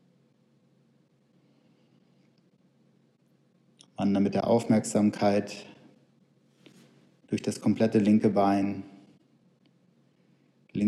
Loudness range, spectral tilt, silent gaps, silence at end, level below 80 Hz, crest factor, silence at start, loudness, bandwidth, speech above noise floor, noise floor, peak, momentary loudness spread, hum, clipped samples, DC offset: 3 LU; -6.5 dB/octave; none; 0 s; -72 dBFS; 18 dB; 4 s; -26 LUFS; 12 kHz; 41 dB; -66 dBFS; -12 dBFS; 18 LU; none; under 0.1%; under 0.1%